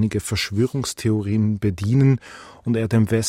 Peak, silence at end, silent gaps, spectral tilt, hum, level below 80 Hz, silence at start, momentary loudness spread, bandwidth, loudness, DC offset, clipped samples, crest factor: -6 dBFS; 0 s; none; -6 dB/octave; none; -46 dBFS; 0 s; 7 LU; 15.5 kHz; -21 LUFS; under 0.1%; under 0.1%; 14 dB